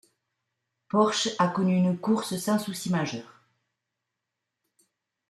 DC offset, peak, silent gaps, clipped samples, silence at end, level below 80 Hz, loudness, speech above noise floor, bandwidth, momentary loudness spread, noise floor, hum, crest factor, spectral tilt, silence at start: under 0.1%; -10 dBFS; none; under 0.1%; 2.05 s; -72 dBFS; -26 LUFS; 59 dB; 13.5 kHz; 5 LU; -85 dBFS; none; 20 dB; -5 dB/octave; 0.95 s